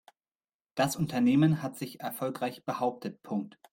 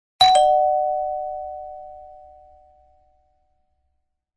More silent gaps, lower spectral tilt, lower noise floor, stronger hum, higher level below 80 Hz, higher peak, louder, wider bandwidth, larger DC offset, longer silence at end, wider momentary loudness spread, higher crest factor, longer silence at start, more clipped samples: neither; first, -6 dB/octave vs -0.5 dB/octave; first, under -90 dBFS vs -72 dBFS; neither; second, -68 dBFS vs -56 dBFS; second, -12 dBFS vs -2 dBFS; second, -30 LUFS vs -19 LUFS; first, 17 kHz vs 10.5 kHz; neither; second, 0.25 s vs 2.2 s; second, 13 LU vs 23 LU; about the same, 18 dB vs 22 dB; first, 0.75 s vs 0.2 s; neither